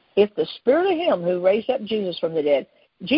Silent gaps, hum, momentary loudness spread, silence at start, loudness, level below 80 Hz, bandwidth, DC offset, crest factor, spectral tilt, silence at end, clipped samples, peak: none; none; 5 LU; 0.15 s; -22 LUFS; -62 dBFS; 5.6 kHz; under 0.1%; 16 dB; -10 dB/octave; 0 s; under 0.1%; -6 dBFS